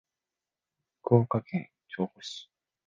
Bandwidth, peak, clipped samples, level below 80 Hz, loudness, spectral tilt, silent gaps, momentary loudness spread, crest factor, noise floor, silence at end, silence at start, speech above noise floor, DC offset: 7.6 kHz; -8 dBFS; under 0.1%; -66 dBFS; -29 LUFS; -7.5 dB/octave; none; 17 LU; 24 dB; under -90 dBFS; 0.45 s; 1.05 s; over 62 dB; under 0.1%